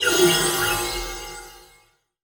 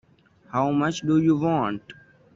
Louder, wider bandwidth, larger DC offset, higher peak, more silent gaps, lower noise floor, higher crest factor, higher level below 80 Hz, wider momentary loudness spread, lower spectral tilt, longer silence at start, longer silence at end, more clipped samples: first, -20 LUFS vs -23 LUFS; first, over 20 kHz vs 7.6 kHz; neither; first, -6 dBFS vs -10 dBFS; neither; about the same, -59 dBFS vs -56 dBFS; about the same, 18 dB vs 14 dB; first, -42 dBFS vs -60 dBFS; first, 19 LU vs 9 LU; second, -2 dB/octave vs -7 dB/octave; second, 0 s vs 0.55 s; first, 0.65 s vs 0.45 s; neither